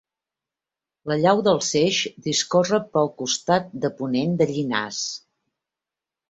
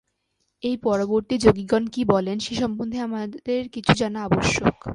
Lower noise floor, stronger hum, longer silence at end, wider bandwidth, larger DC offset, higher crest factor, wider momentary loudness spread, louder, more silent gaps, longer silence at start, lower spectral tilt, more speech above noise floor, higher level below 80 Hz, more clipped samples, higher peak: first, -89 dBFS vs -74 dBFS; neither; first, 1.1 s vs 0 s; second, 8.2 kHz vs 11.5 kHz; neither; about the same, 20 dB vs 22 dB; about the same, 9 LU vs 9 LU; about the same, -22 LUFS vs -23 LUFS; neither; first, 1.05 s vs 0.65 s; second, -4 dB/octave vs -5.5 dB/octave; first, 67 dB vs 51 dB; second, -64 dBFS vs -46 dBFS; neither; second, -4 dBFS vs 0 dBFS